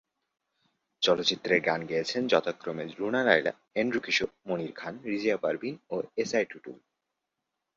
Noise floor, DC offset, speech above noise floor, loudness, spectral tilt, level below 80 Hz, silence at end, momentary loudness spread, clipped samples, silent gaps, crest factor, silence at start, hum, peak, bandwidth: -85 dBFS; under 0.1%; 56 dB; -29 LUFS; -4 dB/octave; -72 dBFS; 1 s; 11 LU; under 0.1%; none; 26 dB; 1 s; none; -6 dBFS; 7.6 kHz